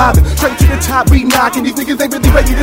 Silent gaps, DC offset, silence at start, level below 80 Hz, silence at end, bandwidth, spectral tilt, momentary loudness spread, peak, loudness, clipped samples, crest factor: none; under 0.1%; 0 s; -14 dBFS; 0 s; 16.5 kHz; -5 dB/octave; 5 LU; 0 dBFS; -11 LUFS; 0.4%; 10 dB